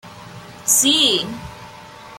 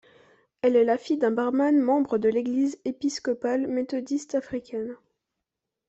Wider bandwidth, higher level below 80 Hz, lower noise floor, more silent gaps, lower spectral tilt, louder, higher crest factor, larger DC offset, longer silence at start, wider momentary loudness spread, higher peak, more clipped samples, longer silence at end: first, 16.5 kHz vs 8.2 kHz; first, -52 dBFS vs -68 dBFS; second, -39 dBFS vs -85 dBFS; neither; second, -1 dB/octave vs -5 dB/octave; first, -15 LUFS vs -25 LUFS; first, 20 dB vs 14 dB; neither; second, 0.05 s vs 0.65 s; first, 25 LU vs 9 LU; first, -2 dBFS vs -10 dBFS; neither; second, 0 s vs 0.95 s